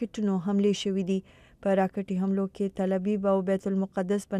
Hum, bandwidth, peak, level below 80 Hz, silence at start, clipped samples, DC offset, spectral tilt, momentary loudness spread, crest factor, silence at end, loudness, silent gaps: none; 11 kHz; -12 dBFS; -62 dBFS; 0 s; under 0.1%; under 0.1%; -7 dB/octave; 4 LU; 16 dB; 0 s; -28 LUFS; none